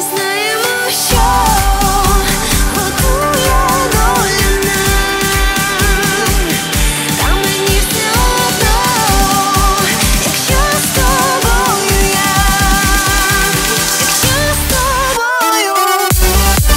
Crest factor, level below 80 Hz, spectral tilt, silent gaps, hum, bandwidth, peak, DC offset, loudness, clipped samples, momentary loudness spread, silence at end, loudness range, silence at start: 12 dB; -18 dBFS; -3 dB/octave; none; none; 16.5 kHz; 0 dBFS; under 0.1%; -11 LUFS; under 0.1%; 2 LU; 0 s; 1 LU; 0 s